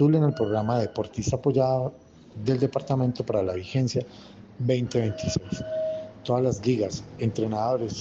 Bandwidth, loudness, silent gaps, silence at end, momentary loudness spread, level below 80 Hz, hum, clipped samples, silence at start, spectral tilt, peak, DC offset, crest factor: 7.8 kHz; -27 LUFS; none; 0 s; 8 LU; -52 dBFS; none; under 0.1%; 0 s; -7 dB/octave; -10 dBFS; under 0.1%; 16 dB